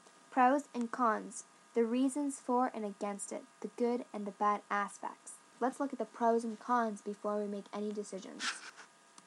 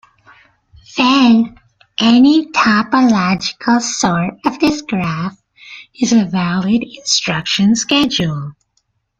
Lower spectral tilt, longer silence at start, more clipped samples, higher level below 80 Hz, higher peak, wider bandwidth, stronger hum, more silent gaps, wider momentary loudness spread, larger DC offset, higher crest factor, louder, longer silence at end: about the same, -4 dB/octave vs -4 dB/octave; second, 0.3 s vs 0.9 s; neither; second, under -90 dBFS vs -50 dBFS; second, -16 dBFS vs 0 dBFS; first, 12.5 kHz vs 9.2 kHz; neither; neither; about the same, 13 LU vs 13 LU; neither; about the same, 18 dB vs 14 dB; second, -36 LUFS vs -14 LUFS; second, 0.4 s vs 0.7 s